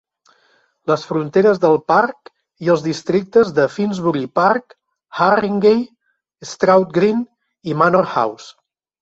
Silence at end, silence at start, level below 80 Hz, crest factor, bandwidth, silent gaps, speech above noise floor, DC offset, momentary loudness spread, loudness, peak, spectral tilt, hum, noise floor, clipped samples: 0.5 s; 0.85 s; -60 dBFS; 16 dB; 8 kHz; none; 48 dB; under 0.1%; 14 LU; -16 LUFS; -2 dBFS; -6.5 dB/octave; none; -64 dBFS; under 0.1%